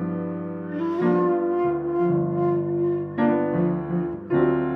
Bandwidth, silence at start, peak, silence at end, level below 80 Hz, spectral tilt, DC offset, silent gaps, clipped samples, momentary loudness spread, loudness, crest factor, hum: 4 kHz; 0 s; -8 dBFS; 0 s; -54 dBFS; -11 dB/octave; under 0.1%; none; under 0.1%; 7 LU; -24 LUFS; 14 dB; none